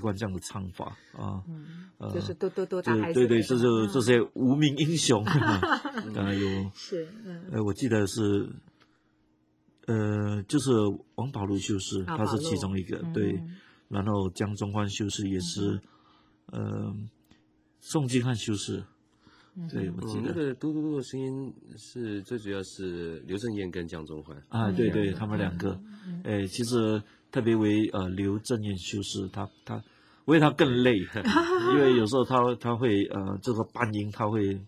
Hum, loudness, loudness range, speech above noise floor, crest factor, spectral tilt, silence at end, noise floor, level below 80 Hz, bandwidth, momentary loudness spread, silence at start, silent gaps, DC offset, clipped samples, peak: none; -28 LUFS; 9 LU; 40 dB; 22 dB; -6 dB/octave; 0 s; -68 dBFS; -54 dBFS; 15 kHz; 15 LU; 0 s; none; under 0.1%; under 0.1%; -6 dBFS